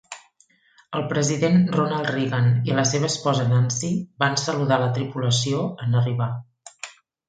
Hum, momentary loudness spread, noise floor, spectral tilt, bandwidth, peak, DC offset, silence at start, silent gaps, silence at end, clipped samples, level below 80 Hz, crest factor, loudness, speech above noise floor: none; 15 LU; -60 dBFS; -5 dB/octave; 9.2 kHz; -4 dBFS; under 0.1%; 0.1 s; none; 0.4 s; under 0.1%; -60 dBFS; 18 dB; -22 LUFS; 39 dB